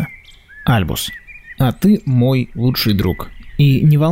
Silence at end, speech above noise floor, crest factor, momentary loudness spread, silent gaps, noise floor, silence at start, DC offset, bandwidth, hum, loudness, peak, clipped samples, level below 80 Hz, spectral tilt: 0 s; 26 dB; 12 dB; 15 LU; none; -40 dBFS; 0 s; under 0.1%; 16 kHz; none; -16 LUFS; -4 dBFS; under 0.1%; -36 dBFS; -6.5 dB/octave